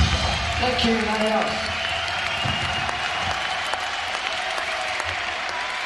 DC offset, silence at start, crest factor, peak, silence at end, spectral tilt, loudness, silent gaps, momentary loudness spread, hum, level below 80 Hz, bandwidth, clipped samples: under 0.1%; 0 s; 18 dB; -8 dBFS; 0 s; -3.5 dB/octave; -23 LUFS; none; 5 LU; none; -38 dBFS; 11.5 kHz; under 0.1%